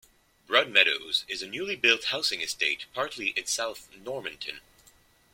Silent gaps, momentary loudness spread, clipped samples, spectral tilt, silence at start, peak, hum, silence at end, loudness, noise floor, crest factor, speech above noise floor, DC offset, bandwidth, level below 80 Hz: none; 16 LU; under 0.1%; -0.5 dB/octave; 0.5 s; -4 dBFS; none; 0.75 s; -26 LUFS; -61 dBFS; 26 dB; 31 dB; under 0.1%; 16.5 kHz; -68 dBFS